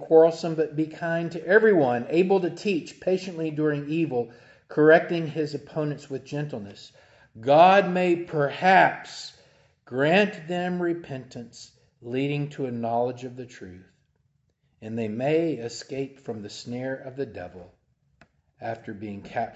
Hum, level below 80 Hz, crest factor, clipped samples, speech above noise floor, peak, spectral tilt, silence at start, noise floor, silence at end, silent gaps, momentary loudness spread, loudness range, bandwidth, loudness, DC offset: none; -66 dBFS; 22 dB; under 0.1%; 46 dB; -4 dBFS; -6.5 dB/octave; 0 s; -70 dBFS; 0.05 s; none; 20 LU; 10 LU; 8.2 kHz; -24 LUFS; under 0.1%